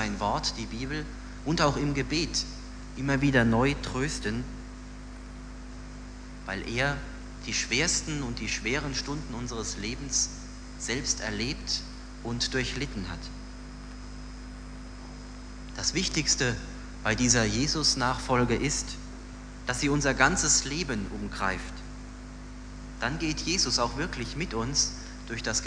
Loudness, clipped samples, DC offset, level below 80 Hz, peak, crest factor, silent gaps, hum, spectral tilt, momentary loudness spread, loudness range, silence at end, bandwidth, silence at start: -28 LUFS; under 0.1%; under 0.1%; -40 dBFS; -6 dBFS; 24 dB; none; 50 Hz at -40 dBFS; -3 dB/octave; 20 LU; 8 LU; 0 s; 10.5 kHz; 0 s